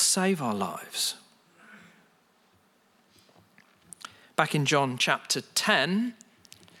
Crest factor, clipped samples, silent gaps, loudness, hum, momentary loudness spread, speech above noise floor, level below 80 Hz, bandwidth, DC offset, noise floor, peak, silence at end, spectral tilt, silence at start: 22 dB; under 0.1%; none; -26 LUFS; none; 16 LU; 38 dB; -80 dBFS; 17 kHz; under 0.1%; -65 dBFS; -8 dBFS; 0.65 s; -3 dB/octave; 0 s